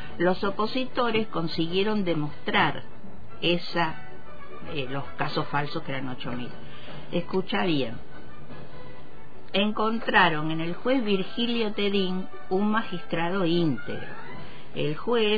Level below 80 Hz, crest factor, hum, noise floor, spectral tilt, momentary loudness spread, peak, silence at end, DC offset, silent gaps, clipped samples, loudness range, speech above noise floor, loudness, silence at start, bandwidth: -54 dBFS; 22 dB; none; -48 dBFS; -7.5 dB/octave; 20 LU; -6 dBFS; 0 s; 4%; none; under 0.1%; 6 LU; 21 dB; -27 LUFS; 0 s; 5 kHz